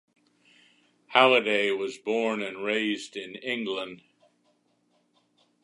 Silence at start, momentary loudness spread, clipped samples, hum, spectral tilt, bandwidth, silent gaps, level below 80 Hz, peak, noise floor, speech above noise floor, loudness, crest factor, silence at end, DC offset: 1.1 s; 15 LU; under 0.1%; none; -3.5 dB/octave; 11.5 kHz; none; -82 dBFS; -2 dBFS; -70 dBFS; 43 dB; -26 LUFS; 26 dB; 1.65 s; under 0.1%